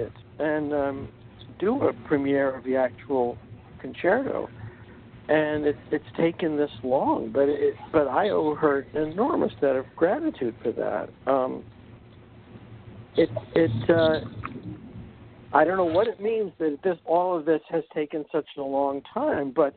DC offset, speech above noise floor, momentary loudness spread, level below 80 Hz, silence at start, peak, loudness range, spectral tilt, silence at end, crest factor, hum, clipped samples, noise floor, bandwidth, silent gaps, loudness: under 0.1%; 24 dB; 16 LU; -56 dBFS; 0 s; -4 dBFS; 3 LU; -5.5 dB/octave; 0.05 s; 22 dB; none; under 0.1%; -49 dBFS; 4.6 kHz; none; -25 LUFS